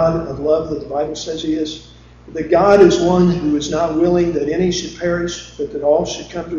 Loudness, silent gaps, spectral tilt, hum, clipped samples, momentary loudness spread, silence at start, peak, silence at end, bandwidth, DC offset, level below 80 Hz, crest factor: -17 LUFS; none; -6 dB/octave; none; under 0.1%; 15 LU; 0 s; 0 dBFS; 0 s; 7.6 kHz; under 0.1%; -40 dBFS; 16 dB